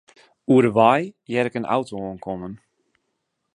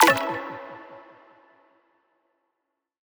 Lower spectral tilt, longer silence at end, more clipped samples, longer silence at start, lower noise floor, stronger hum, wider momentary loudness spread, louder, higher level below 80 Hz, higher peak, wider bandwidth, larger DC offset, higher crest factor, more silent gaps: first, -7 dB/octave vs -2 dB/octave; second, 1 s vs 2.15 s; neither; first, 0.5 s vs 0 s; second, -76 dBFS vs -81 dBFS; neither; second, 16 LU vs 25 LU; first, -21 LUFS vs -25 LUFS; first, -60 dBFS vs -72 dBFS; about the same, -2 dBFS vs -2 dBFS; second, 11 kHz vs over 20 kHz; neither; second, 20 dB vs 26 dB; neither